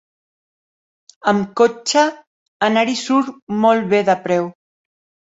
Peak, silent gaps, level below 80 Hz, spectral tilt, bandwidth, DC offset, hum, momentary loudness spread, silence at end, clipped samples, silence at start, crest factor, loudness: 0 dBFS; 2.27-2.60 s, 3.42-3.47 s; -64 dBFS; -4.5 dB/octave; 8 kHz; under 0.1%; none; 6 LU; 0.8 s; under 0.1%; 1.25 s; 18 dB; -17 LUFS